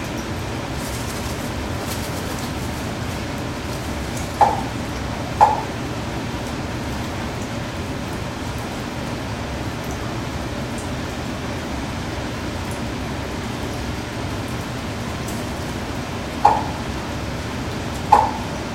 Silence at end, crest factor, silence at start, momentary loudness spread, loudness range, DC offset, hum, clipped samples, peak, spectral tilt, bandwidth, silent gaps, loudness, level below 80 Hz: 0 s; 24 dB; 0 s; 9 LU; 5 LU; under 0.1%; none; under 0.1%; 0 dBFS; -5 dB/octave; 16.5 kHz; none; -24 LUFS; -36 dBFS